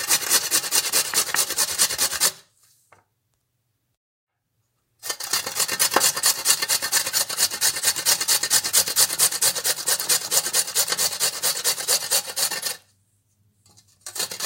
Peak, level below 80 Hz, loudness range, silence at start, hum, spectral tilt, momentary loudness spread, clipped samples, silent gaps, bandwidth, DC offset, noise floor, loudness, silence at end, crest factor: 0 dBFS; -66 dBFS; 8 LU; 0 s; none; 1.5 dB/octave; 7 LU; under 0.1%; 3.97-4.27 s; 17 kHz; under 0.1%; -74 dBFS; -19 LUFS; 0 s; 24 dB